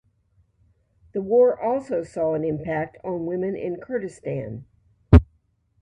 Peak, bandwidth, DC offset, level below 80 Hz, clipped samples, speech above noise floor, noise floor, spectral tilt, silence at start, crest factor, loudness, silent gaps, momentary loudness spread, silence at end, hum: 0 dBFS; 9.4 kHz; under 0.1%; -32 dBFS; under 0.1%; 41 dB; -65 dBFS; -9.5 dB/octave; 1.15 s; 24 dB; -23 LUFS; none; 14 LU; 0.6 s; none